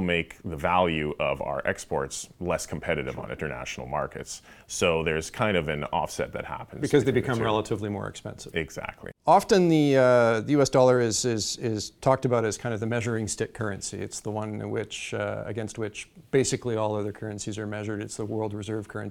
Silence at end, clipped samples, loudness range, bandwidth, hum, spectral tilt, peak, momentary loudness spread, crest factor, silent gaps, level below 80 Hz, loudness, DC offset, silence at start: 0 s; under 0.1%; 8 LU; 17 kHz; none; -5 dB/octave; -6 dBFS; 14 LU; 20 dB; none; -52 dBFS; -27 LUFS; under 0.1%; 0 s